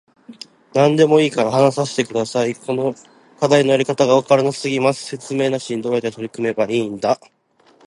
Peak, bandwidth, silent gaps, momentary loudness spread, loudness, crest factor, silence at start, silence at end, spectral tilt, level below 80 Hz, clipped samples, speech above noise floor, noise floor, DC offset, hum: 0 dBFS; 11.5 kHz; none; 11 LU; -18 LUFS; 18 dB; 0.3 s; 0.7 s; -5.5 dB/octave; -64 dBFS; under 0.1%; 37 dB; -54 dBFS; under 0.1%; none